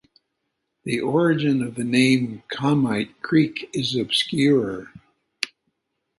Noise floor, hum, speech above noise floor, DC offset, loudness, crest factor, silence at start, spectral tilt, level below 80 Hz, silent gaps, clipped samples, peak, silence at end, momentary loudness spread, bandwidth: -77 dBFS; none; 56 dB; under 0.1%; -22 LUFS; 20 dB; 0.85 s; -5.5 dB/octave; -62 dBFS; none; under 0.1%; -2 dBFS; 0.75 s; 11 LU; 11.5 kHz